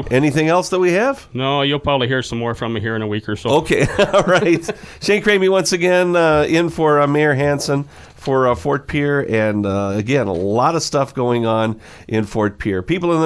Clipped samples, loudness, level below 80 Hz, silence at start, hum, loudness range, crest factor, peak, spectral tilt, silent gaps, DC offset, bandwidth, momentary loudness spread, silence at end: under 0.1%; -17 LUFS; -42 dBFS; 0 s; none; 3 LU; 14 dB; -2 dBFS; -5.5 dB/octave; none; under 0.1%; 11 kHz; 8 LU; 0 s